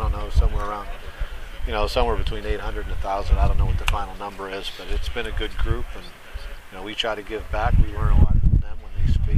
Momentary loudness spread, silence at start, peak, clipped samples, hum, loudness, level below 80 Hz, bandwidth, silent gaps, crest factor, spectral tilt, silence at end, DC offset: 14 LU; 0 s; 0 dBFS; under 0.1%; none; -25 LUFS; -24 dBFS; 12.5 kHz; none; 20 dB; -6 dB/octave; 0 s; under 0.1%